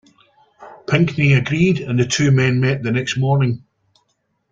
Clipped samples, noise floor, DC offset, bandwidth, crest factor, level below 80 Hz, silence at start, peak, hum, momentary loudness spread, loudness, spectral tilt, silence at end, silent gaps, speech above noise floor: under 0.1%; -68 dBFS; under 0.1%; 7.8 kHz; 14 dB; -50 dBFS; 0.6 s; -4 dBFS; none; 6 LU; -17 LUFS; -6 dB/octave; 0.95 s; none; 52 dB